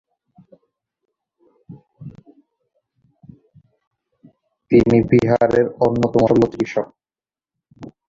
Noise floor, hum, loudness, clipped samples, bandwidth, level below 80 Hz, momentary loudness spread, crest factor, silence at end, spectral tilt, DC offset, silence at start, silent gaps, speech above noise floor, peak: under -90 dBFS; none; -16 LUFS; under 0.1%; 7.6 kHz; -48 dBFS; 25 LU; 20 dB; 0.2 s; -8.5 dB/octave; under 0.1%; 1.7 s; 3.87-3.91 s; over 75 dB; -2 dBFS